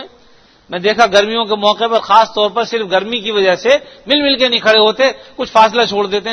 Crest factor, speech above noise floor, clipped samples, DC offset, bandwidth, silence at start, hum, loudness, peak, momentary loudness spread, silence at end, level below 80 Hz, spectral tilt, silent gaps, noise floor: 14 dB; 34 dB; 0.2%; under 0.1%; 11 kHz; 0 s; none; -12 LUFS; 0 dBFS; 7 LU; 0 s; -52 dBFS; -3 dB/octave; none; -46 dBFS